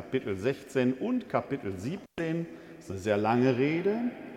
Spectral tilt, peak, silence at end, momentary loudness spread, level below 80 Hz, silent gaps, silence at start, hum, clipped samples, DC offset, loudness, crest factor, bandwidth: -7 dB/octave; -12 dBFS; 0 s; 12 LU; -66 dBFS; none; 0 s; none; under 0.1%; under 0.1%; -30 LUFS; 18 dB; 13.5 kHz